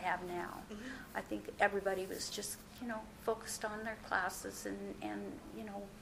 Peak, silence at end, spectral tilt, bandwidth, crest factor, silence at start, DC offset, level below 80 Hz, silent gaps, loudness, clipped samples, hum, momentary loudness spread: -16 dBFS; 0 s; -3 dB/octave; 16 kHz; 24 dB; 0 s; under 0.1%; -62 dBFS; none; -41 LUFS; under 0.1%; none; 12 LU